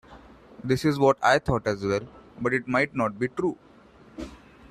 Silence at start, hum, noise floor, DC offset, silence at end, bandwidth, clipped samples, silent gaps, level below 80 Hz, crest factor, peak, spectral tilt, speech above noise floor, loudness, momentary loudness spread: 0.1 s; none; -52 dBFS; under 0.1%; 0.35 s; 14 kHz; under 0.1%; none; -50 dBFS; 20 dB; -6 dBFS; -6 dB/octave; 28 dB; -25 LUFS; 20 LU